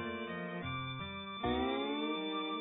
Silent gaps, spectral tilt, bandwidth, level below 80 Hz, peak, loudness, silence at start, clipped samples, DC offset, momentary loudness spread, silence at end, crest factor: none; -3 dB/octave; 3.9 kHz; -56 dBFS; -22 dBFS; -38 LUFS; 0 s; under 0.1%; under 0.1%; 6 LU; 0 s; 16 dB